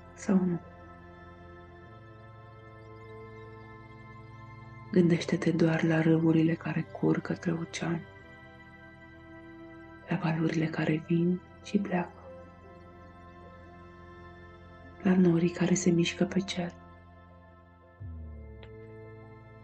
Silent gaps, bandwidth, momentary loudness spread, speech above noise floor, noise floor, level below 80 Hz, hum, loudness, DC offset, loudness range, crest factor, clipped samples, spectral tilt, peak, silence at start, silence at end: none; 8.8 kHz; 25 LU; 28 dB; -56 dBFS; -58 dBFS; none; -29 LUFS; under 0.1%; 16 LU; 20 dB; under 0.1%; -6.5 dB/octave; -12 dBFS; 0 s; 0 s